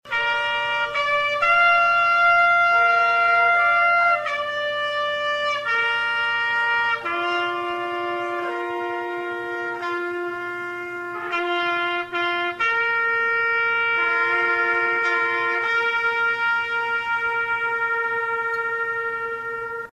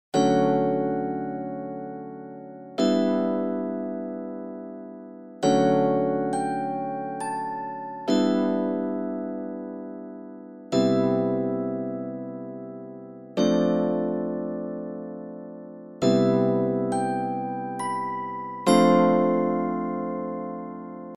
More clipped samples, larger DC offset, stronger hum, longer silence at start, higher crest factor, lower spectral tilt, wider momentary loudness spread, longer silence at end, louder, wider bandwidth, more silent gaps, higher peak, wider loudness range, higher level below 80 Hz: neither; neither; first, 60 Hz at -55 dBFS vs none; about the same, 0.05 s vs 0.15 s; about the same, 14 dB vs 18 dB; second, -3 dB/octave vs -6.5 dB/octave; second, 11 LU vs 18 LU; about the same, 0.1 s vs 0 s; first, -21 LUFS vs -25 LUFS; about the same, 12.5 kHz vs 11.5 kHz; neither; about the same, -8 dBFS vs -8 dBFS; first, 9 LU vs 4 LU; first, -62 dBFS vs -74 dBFS